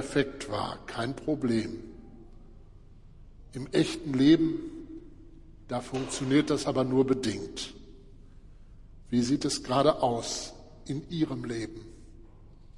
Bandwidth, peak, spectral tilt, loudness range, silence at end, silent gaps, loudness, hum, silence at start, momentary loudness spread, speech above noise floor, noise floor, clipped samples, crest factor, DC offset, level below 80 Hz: 11.5 kHz; -10 dBFS; -5.5 dB/octave; 5 LU; 0 s; none; -29 LUFS; none; 0 s; 18 LU; 23 dB; -51 dBFS; under 0.1%; 20 dB; under 0.1%; -52 dBFS